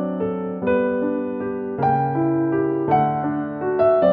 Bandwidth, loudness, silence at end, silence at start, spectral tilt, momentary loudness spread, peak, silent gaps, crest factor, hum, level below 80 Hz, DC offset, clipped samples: 4.9 kHz; -21 LUFS; 0 s; 0 s; -11 dB/octave; 6 LU; -6 dBFS; none; 14 dB; none; -54 dBFS; under 0.1%; under 0.1%